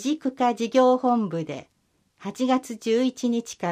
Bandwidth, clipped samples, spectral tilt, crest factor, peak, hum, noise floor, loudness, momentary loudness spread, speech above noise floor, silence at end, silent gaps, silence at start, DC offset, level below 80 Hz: 15 kHz; under 0.1%; -5 dB/octave; 16 dB; -8 dBFS; none; -68 dBFS; -24 LUFS; 15 LU; 45 dB; 0 s; none; 0 s; under 0.1%; -72 dBFS